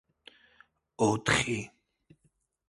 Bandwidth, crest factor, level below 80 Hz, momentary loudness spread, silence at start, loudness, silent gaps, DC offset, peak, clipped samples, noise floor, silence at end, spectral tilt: 11.5 kHz; 24 dB; -56 dBFS; 11 LU; 1 s; -28 LUFS; none; under 0.1%; -10 dBFS; under 0.1%; -73 dBFS; 1.05 s; -4 dB/octave